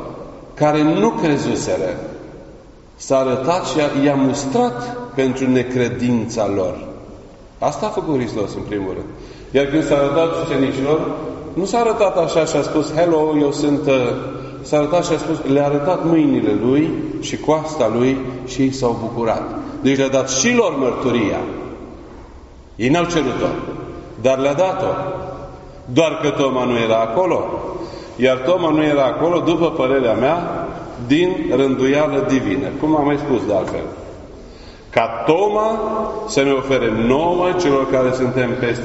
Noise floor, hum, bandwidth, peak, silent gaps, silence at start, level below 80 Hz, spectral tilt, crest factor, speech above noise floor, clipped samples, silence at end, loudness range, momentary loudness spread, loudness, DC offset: -41 dBFS; none; 8 kHz; 0 dBFS; none; 0 s; -42 dBFS; -5 dB/octave; 18 dB; 24 dB; under 0.1%; 0 s; 3 LU; 13 LU; -18 LUFS; under 0.1%